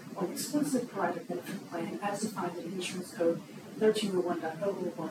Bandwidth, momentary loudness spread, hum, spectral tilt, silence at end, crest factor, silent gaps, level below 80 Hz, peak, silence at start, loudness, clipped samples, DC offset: 17.5 kHz; 9 LU; none; -5 dB/octave; 0 s; 18 dB; none; -82 dBFS; -14 dBFS; 0 s; -33 LUFS; under 0.1%; under 0.1%